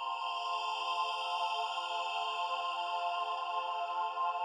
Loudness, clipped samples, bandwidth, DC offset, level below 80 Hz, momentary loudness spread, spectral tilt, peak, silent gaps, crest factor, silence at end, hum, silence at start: -35 LUFS; under 0.1%; 12 kHz; under 0.1%; under -90 dBFS; 2 LU; 3 dB/octave; -22 dBFS; none; 12 dB; 0 s; none; 0 s